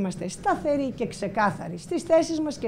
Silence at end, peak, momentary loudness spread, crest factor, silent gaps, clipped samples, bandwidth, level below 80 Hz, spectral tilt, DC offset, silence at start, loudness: 0 s; -10 dBFS; 9 LU; 16 dB; none; under 0.1%; 14 kHz; -54 dBFS; -5.5 dB/octave; under 0.1%; 0 s; -26 LUFS